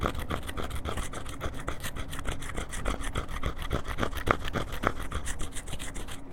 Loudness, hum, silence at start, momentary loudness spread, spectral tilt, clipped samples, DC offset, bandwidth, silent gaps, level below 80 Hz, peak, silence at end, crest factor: -35 LUFS; none; 0 s; 9 LU; -4.5 dB/octave; under 0.1%; under 0.1%; 17 kHz; none; -38 dBFS; -2 dBFS; 0 s; 30 dB